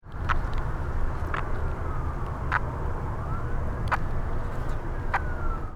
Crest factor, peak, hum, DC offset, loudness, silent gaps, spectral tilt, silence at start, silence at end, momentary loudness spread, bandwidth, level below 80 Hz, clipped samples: 18 dB; -8 dBFS; none; under 0.1%; -31 LUFS; none; -7.5 dB/octave; 0.05 s; 0 s; 5 LU; 7.2 kHz; -30 dBFS; under 0.1%